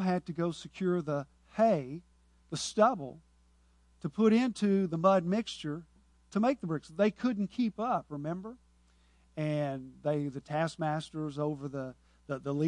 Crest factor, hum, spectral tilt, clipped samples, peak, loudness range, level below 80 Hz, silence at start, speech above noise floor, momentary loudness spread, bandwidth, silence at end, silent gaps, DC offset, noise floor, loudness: 20 dB; none; -6.5 dB/octave; under 0.1%; -12 dBFS; 6 LU; -66 dBFS; 0 s; 34 dB; 14 LU; 11 kHz; 0 s; none; under 0.1%; -65 dBFS; -32 LUFS